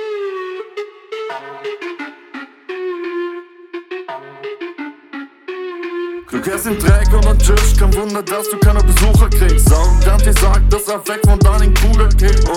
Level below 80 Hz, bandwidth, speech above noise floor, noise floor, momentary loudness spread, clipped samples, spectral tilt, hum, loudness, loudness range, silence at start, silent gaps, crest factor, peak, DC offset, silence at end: -14 dBFS; 16 kHz; 24 dB; -34 dBFS; 18 LU; under 0.1%; -5.5 dB/octave; none; -14 LUFS; 14 LU; 0 s; none; 12 dB; -2 dBFS; under 0.1%; 0 s